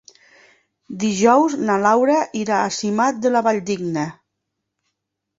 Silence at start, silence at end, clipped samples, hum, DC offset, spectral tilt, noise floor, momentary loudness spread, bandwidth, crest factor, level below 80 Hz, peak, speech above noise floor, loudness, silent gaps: 0.9 s; 1.25 s; under 0.1%; none; under 0.1%; -5 dB/octave; -78 dBFS; 10 LU; 8 kHz; 18 dB; -64 dBFS; -2 dBFS; 60 dB; -18 LUFS; none